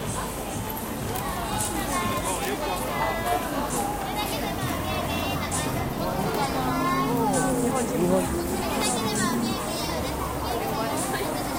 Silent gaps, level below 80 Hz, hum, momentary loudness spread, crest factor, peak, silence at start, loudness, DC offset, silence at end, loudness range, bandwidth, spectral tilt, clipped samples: none; -40 dBFS; none; 5 LU; 18 dB; -10 dBFS; 0 s; -26 LUFS; under 0.1%; 0 s; 3 LU; 17 kHz; -4 dB/octave; under 0.1%